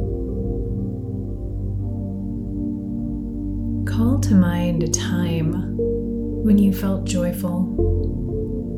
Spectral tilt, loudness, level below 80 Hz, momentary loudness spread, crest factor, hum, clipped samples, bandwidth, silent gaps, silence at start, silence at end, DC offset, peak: -6.5 dB/octave; -22 LUFS; -30 dBFS; 11 LU; 18 dB; 50 Hz at -40 dBFS; under 0.1%; 16.5 kHz; none; 0 s; 0 s; under 0.1%; -4 dBFS